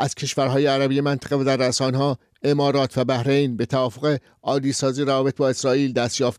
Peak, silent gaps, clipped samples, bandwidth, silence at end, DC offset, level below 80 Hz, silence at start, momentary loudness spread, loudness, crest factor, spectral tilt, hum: -10 dBFS; none; under 0.1%; 14 kHz; 0.05 s; under 0.1%; -60 dBFS; 0 s; 4 LU; -21 LUFS; 12 dB; -5 dB/octave; none